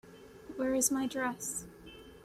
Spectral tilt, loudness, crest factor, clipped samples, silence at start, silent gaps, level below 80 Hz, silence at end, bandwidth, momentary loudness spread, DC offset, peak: -2.5 dB/octave; -33 LUFS; 20 dB; under 0.1%; 0.05 s; none; -64 dBFS; 0 s; 16 kHz; 23 LU; under 0.1%; -16 dBFS